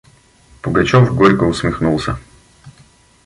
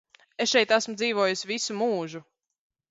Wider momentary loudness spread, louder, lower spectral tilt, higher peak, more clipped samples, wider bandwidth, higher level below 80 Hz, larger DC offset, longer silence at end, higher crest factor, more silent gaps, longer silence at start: about the same, 14 LU vs 16 LU; first, -14 LUFS vs -25 LUFS; first, -7 dB/octave vs -2.5 dB/octave; first, 0 dBFS vs -8 dBFS; neither; first, 11.5 kHz vs 8 kHz; first, -36 dBFS vs -74 dBFS; neither; second, 0.55 s vs 0.7 s; about the same, 16 dB vs 20 dB; neither; first, 0.65 s vs 0.4 s